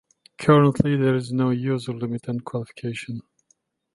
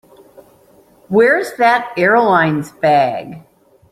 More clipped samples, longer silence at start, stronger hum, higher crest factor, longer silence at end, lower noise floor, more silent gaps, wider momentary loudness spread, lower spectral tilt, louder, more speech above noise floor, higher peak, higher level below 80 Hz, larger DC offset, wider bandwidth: neither; second, 0.4 s vs 1.1 s; neither; first, 20 dB vs 14 dB; first, 0.75 s vs 0.5 s; first, -67 dBFS vs -49 dBFS; neither; first, 15 LU vs 7 LU; first, -8 dB/octave vs -6 dB/octave; second, -23 LUFS vs -14 LUFS; first, 45 dB vs 35 dB; about the same, -2 dBFS vs -2 dBFS; about the same, -56 dBFS vs -58 dBFS; neither; second, 11.5 kHz vs 15.5 kHz